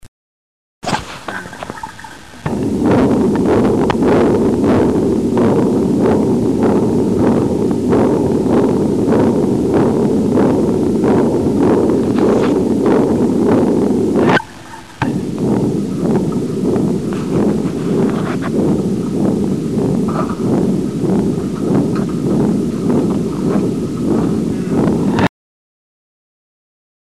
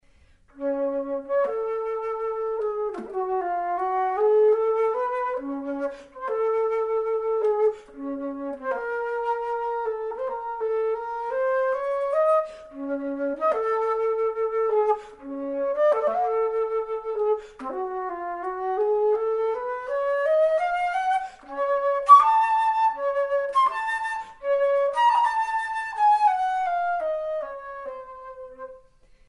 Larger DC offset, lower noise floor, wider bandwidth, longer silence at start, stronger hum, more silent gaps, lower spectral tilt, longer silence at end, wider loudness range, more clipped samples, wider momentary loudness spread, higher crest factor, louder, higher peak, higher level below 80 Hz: first, 0.7% vs under 0.1%; second, -34 dBFS vs -57 dBFS; first, 13.5 kHz vs 11 kHz; second, 0.05 s vs 0.55 s; neither; first, 0.08-0.81 s vs none; first, -7.5 dB/octave vs -4 dB/octave; first, 1.9 s vs 0.5 s; second, 4 LU vs 7 LU; neither; second, 6 LU vs 11 LU; second, 14 dB vs 22 dB; first, -14 LUFS vs -24 LUFS; first, 0 dBFS vs -4 dBFS; first, -38 dBFS vs -60 dBFS